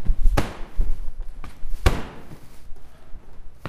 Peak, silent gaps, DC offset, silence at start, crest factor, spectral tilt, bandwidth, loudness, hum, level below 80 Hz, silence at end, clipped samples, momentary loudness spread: -2 dBFS; none; under 0.1%; 0 s; 18 dB; -5.5 dB/octave; 12.5 kHz; -28 LUFS; none; -24 dBFS; 0 s; under 0.1%; 24 LU